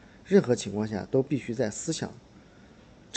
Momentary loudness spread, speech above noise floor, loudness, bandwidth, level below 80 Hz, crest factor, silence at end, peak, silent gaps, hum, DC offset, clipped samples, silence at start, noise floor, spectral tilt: 9 LU; 26 dB; -28 LUFS; 9.2 kHz; -60 dBFS; 20 dB; 0 s; -8 dBFS; none; none; under 0.1%; under 0.1%; 0.25 s; -53 dBFS; -5.5 dB/octave